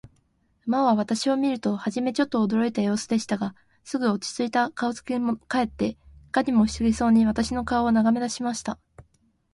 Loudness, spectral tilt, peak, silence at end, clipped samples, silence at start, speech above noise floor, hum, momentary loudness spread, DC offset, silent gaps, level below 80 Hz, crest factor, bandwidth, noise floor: -24 LUFS; -5 dB/octave; -8 dBFS; 0.55 s; under 0.1%; 0.65 s; 43 dB; none; 8 LU; under 0.1%; none; -50 dBFS; 16 dB; 11.5 kHz; -66 dBFS